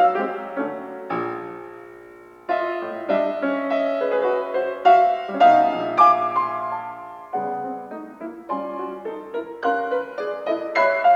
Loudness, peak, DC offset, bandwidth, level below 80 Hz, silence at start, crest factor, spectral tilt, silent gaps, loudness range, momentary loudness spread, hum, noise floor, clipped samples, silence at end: -22 LUFS; -4 dBFS; under 0.1%; 7 kHz; -68 dBFS; 0 s; 18 dB; -6 dB/octave; none; 10 LU; 19 LU; none; -44 dBFS; under 0.1%; 0 s